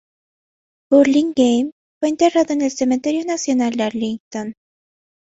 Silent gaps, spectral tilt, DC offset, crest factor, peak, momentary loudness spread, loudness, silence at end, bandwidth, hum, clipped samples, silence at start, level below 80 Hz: 1.72-2.01 s, 4.20-4.31 s; -4 dB/octave; under 0.1%; 16 dB; -2 dBFS; 13 LU; -18 LUFS; 0.7 s; 8.2 kHz; none; under 0.1%; 0.9 s; -62 dBFS